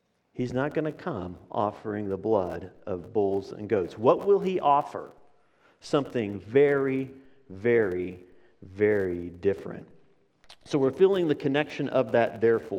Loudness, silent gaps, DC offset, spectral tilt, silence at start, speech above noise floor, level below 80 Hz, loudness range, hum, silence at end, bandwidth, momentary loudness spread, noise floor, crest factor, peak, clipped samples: -27 LUFS; none; under 0.1%; -7.5 dB/octave; 0.35 s; 37 dB; -66 dBFS; 4 LU; none; 0 s; 9.2 kHz; 14 LU; -63 dBFS; 20 dB; -6 dBFS; under 0.1%